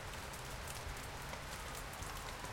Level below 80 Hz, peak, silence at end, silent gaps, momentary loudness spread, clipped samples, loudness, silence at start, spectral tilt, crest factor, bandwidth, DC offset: -54 dBFS; -30 dBFS; 0 s; none; 1 LU; under 0.1%; -46 LUFS; 0 s; -3 dB/octave; 16 dB; 17 kHz; under 0.1%